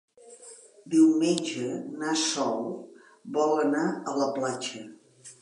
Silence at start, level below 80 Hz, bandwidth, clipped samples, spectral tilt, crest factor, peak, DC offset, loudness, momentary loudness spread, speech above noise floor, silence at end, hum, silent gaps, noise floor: 0.25 s; -82 dBFS; 11 kHz; under 0.1%; -4 dB/octave; 18 dB; -10 dBFS; under 0.1%; -27 LUFS; 24 LU; 24 dB; 0.1 s; none; none; -50 dBFS